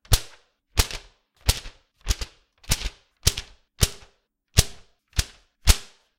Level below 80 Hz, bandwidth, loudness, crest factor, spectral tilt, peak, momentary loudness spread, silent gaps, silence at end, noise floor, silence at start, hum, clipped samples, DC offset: -30 dBFS; 17 kHz; -26 LUFS; 26 dB; -2.5 dB/octave; 0 dBFS; 16 LU; none; 0.35 s; -64 dBFS; 0.1 s; none; under 0.1%; under 0.1%